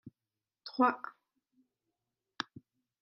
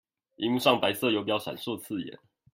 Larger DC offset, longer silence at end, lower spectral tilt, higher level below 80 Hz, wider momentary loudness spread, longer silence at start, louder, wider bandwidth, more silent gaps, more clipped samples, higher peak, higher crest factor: neither; first, 1.9 s vs 0.4 s; about the same, -5 dB/octave vs -4.5 dB/octave; second, -84 dBFS vs -72 dBFS; first, 18 LU vs 12 LU; second, 0.05 s vs 0.4 s; second, -34 LUFS vs -28 LUFS; second, 7 kHz vs 16.5 kHz; neither; neither; second, -14 dBFS vs -6 dBFS; about the same, 26 dB vs 22 dB